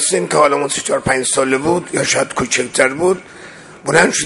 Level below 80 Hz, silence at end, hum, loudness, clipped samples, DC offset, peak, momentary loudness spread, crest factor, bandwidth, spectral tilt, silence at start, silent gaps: -48 dBFS; 0 s; none; -15 LUFS; under 0.1%; under 0.1%; 0 dBFS; 11 LU; 16 dB; 11.5 kHz; -3 dB/octave; 0 s; none